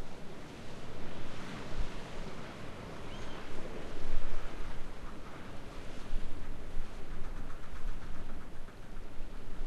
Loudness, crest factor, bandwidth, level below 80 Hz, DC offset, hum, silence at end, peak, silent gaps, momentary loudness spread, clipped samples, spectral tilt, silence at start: -46 LUFS; 16 dB; 6.8 kHz; -38 dBFS; under 0.1%; none; 0 s; -14 dBFS; none; 6 LU; under 0.1%; -5.5 dB/octave; 0 s